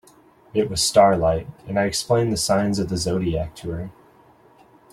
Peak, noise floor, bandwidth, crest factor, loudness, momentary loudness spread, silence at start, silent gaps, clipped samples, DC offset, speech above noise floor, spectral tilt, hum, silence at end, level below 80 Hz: -2 dBFS; -53 dBFS; 16 kHz; 20 dB; -21 LUFS; 15 LU; 0.55 s; none; under 0.1%; under 0.1%; 32 dB; -4.5 dB/octave; none; 1 s; -44 dBFS